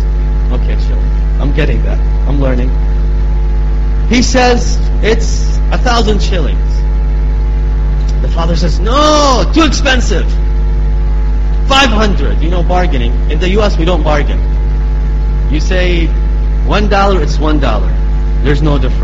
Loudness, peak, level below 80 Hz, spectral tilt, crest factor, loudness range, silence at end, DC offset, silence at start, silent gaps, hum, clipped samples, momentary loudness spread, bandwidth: -12 LUFS; 0 dBFS; -10 dBFS; -5.5 dB/octave; 10 dB; 2 LU; 0 s; under 0.1%; 0 s; none; none; under 0.1%; 5 LU; 7.8 kHz